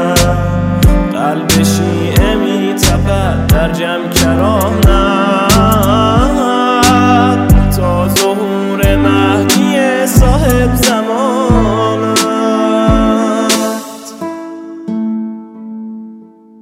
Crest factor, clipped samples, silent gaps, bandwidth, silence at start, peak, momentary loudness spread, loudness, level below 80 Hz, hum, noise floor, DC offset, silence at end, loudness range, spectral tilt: 10 dB; under 0.1%; none; 16.5 kHz; 0 s; 0 dBFS; 13 LU; -11 LUFS; -20 dBFS; none; -36 dBFS; under 0.1%; 0.35 s; 4 LU; -5 dB/octave